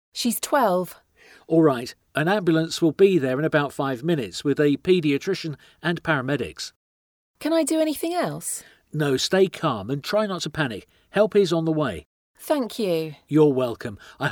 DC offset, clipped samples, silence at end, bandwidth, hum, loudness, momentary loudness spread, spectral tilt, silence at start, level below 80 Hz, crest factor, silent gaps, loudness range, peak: under 0.1%; under 0.1%; 0 s; 19.5 kHz; none; -23 LUFS; 11 LU; -5 dB/octave; 0.15 s; -60 dBFS; 18 dB; 6.76-7.34 s, 12.06-12.34 s; 4 LU; -6 dBFS